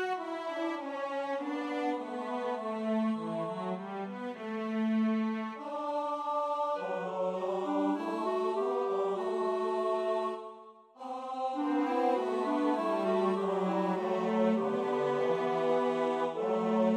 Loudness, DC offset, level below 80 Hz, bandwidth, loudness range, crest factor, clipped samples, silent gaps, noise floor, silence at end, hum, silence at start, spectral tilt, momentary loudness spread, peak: -32 LUFS; under 0.1%; -84 dBFS; 9.8 kHz; 4 LU; 14 dB; under 0.1%; none; -53 dBFS; 0 s; none; 0 s; -7 dB/octave; 8 LU; -18 dBFS